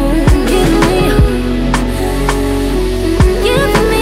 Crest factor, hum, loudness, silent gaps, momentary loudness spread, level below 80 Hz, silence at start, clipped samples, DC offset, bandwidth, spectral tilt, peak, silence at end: 10 dB; none; -12 LUFS; none; 4 LU; -16 dBFS; 0 s; under 0.1%; under 0.1%; 16 kHz; -6 dB/octave; 0 dBFS; 0 s